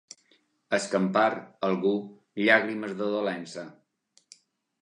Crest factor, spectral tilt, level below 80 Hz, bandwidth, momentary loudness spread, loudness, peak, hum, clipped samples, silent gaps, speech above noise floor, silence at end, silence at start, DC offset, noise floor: 22 dB; -5 dB/octave; -80 dBFS; 11 kHz; 17 LU; -27 LUFS; -6 dBFS; none; under 0.1%; none; 41 dB; 1.1 s; 0.7 s; under 0.1%; -67 dBFS